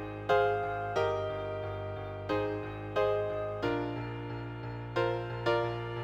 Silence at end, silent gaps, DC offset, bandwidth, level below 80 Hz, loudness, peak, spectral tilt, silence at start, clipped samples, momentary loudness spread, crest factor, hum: 0 s; none; under 0.1%; 9.2 kHz; -54 dBFS; -33 LUFS; -14 dBFS; -7 dB/octave; 0 s; under 0.1%; 9 LU; 18 dB; none